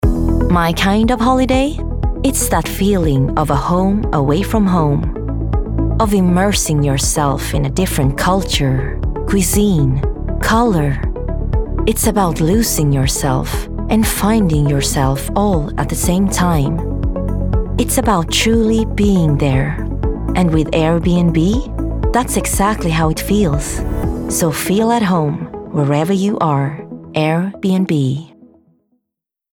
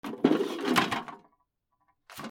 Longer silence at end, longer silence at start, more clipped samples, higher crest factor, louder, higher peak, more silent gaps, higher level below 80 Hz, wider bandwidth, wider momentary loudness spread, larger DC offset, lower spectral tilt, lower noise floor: first, 1.25 s vs 0 s; about the same, 0 s vs 0.05 s; neither; second, 14 dB vs 24 dB; first, -15 LUFS vs -28 LUFS; first, -2 dBFS vs -6 dBFS; neither; first, -22 dBFS vs -74 dBFS; first, 20 kHz vs 18 kHz; second, 7 LU vs 19 LU; neither; about the same, -5.5 dB/octave vs -4.5 dB/octave; first, -81 dBFS vs -76 dBFS